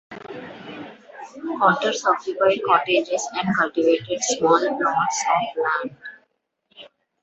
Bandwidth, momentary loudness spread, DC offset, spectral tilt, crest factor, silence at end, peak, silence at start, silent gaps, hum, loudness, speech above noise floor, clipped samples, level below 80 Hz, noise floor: 8.2 kHz; 19 LU; under 0.1%; -3.5 dB/octave; 20 dB; 0.35 s; -2 dBFS; 0.1 s; none; none; -21 LUFS; 48 dB; under 0.1%; -68 dBFS; -69 dBFS